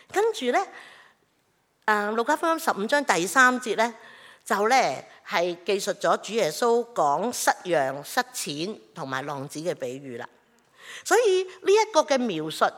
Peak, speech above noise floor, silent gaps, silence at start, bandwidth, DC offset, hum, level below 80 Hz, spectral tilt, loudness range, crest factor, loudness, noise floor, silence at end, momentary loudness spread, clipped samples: -4 dBFS; 44 dB; none; 0.1 s; 17.5 kHz; under 0.1%; none; -82 dBFS; -3 dB/octave; 5 LU; 22 dB; -24 LUFS; -68 dBFS; 0 s; 14 LU; under 0.1%